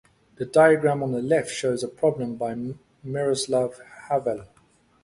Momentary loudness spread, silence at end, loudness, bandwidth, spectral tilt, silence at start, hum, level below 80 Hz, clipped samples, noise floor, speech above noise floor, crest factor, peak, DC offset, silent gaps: 17 LU; 0.6 s; -24 LUFS; 11.5 kHz; -5 dB/octave; 0.4 s; none; -62 dBFS; under 0.1%; -61 dBFS; 37 dB; 20 dB; -6 dBFS; under 0.1%; none